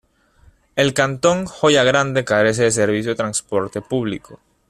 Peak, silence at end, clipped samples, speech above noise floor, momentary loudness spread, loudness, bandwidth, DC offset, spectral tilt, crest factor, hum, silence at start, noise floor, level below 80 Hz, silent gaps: -2 dBFS; 0.35 s; under 0.1%; 35 dB; 9 LU; -18 LUFS; 13.5 kHz; under 0.1%; -4 dB/octave; 18 dB; none; 0.75 s; -53 dBFS; -52 dBFS; none